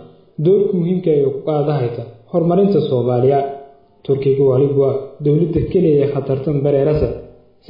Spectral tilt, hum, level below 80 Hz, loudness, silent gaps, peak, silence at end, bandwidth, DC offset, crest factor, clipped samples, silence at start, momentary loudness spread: -12.5 dB/octave; none; -40 dBFS; -16 LUFS; none; -4 dBFS; 0.4 s; 5.4 kHz; under 0.1%; 12 dB; under 0.1%; 0 s; 8 LU